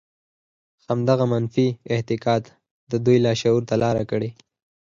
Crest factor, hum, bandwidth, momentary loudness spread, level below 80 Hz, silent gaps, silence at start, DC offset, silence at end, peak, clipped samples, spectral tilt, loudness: 18 dB; none; 7.6 kHz; 9 LU; -56 dBFS; 2.71-2.87 s; 0.9 s; under 0.1%; 0.55 s; -6 dBFS; under 0.1%; -7 dB/octave; -22 LUFS